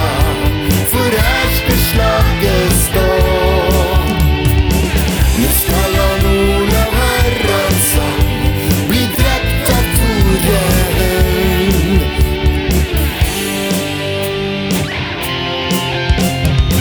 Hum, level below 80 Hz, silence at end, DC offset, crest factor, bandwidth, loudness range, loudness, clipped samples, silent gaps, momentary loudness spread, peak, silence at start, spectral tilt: none; -18 dBFS; 0 s; under 0.1%; 12 dB; over 20 kHz; 3 LU; -13 LUFS; under 0.1%; none; 4 LU; 0 dBFS; 0 s; -4.5 dB/octave